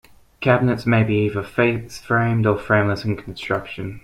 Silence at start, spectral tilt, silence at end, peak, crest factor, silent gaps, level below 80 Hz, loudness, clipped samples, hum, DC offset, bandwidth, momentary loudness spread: 0.4 s; -7.5 dB/octave; 0.05 s; -2 dBFS; 18 dB; none; -48 dBFS; -20 LUFS; under 0.1%; none; under 0.1%; 12.5 kHz; 8 LU